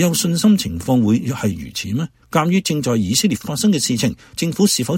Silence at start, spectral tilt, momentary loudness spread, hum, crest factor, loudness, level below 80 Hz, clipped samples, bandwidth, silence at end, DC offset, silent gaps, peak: 0 s; -4.5 dB/octave; 8 LU; none; 16 dB; -18 LUFS; -46 dBFS; under 0.1%; 16.5 kHz; 0 s; under 0.1%; none; -2 dBFS